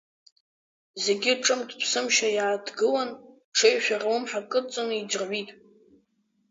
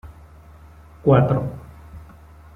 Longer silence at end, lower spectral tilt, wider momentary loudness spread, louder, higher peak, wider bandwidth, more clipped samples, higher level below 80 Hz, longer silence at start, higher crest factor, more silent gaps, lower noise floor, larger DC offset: first, 1 s vs 0.55 s; second, -1 dB/octave vs -10 dB/octave; second, 10 LU vs 26 LU; second, -25 LUFS vs -19 LUFS; second, -8 dBFS vs -2 dBFS; first, 7.8 kHz vs 3.8 kHz; neither; second, -80 dBFS vs -44 dBFS; first, 0.95 s vs 0.05 s; about the same, 20 dB vs 20 dB; first, 3.44-3.52 s vs none; first, -71 dBFS vs -45 dBFS; neither